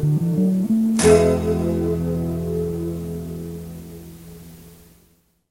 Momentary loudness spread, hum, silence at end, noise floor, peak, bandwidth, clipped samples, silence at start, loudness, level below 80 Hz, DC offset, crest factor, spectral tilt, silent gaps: 24 LU; none; 0.75 s; -59 dBFS; -2 dBFS; 16.5 kHz; under 0.1%; 0 s; -20 LUFS; -40 dBFS; under 0.1%; 18 dB; -6.5 dB/octave; none